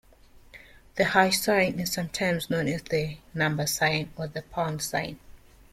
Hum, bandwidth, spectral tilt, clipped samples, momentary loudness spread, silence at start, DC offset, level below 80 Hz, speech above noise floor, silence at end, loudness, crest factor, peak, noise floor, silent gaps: none; 16.5 kHz; -4 dB/octave; under 0.1%; 12 LU; 0.35 s; under 0.1%; -54 dBFS; 27 dB; 0.35 s; -26 LUFS; 22 dB; -6 dBFS; -54 dBFS; none